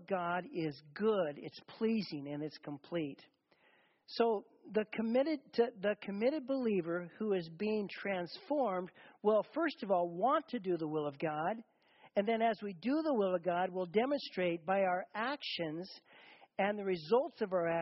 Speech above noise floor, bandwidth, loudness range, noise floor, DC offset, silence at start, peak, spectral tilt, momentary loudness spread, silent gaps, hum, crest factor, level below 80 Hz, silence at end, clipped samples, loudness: 35 dB; 5.8 kHz; 4 LU; -71 dBFS; under 0.1%; 0 s; -18 dBFS; -4.5 dB/octave; 9 LU; none; none; 18 dB; -80 dBFS; 0 s; under 0.1%; -36 LUFS